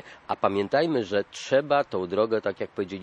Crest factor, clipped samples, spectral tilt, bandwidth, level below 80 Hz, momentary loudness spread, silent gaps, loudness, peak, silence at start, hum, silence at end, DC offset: 20 dB; under 0.1%; -5.5 dB/octave; 9.4 kHz; -68 dBFS; 8 LU; none; -26 LUFS; -6 dBFS; 0.05 s; none; 0 s; under 0.1%